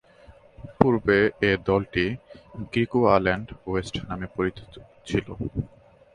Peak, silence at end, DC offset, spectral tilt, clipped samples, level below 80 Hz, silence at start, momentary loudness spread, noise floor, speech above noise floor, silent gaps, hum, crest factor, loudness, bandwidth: 0 dBFS; 0.5 s; under 0.1%; -7 dB/octave; under 0.1%; -46 dBFS; 0.3 s; 18 LU; -52 dBFS; 27 dB; none; none; 24 dB; -25 LUFS; 10.5 kHz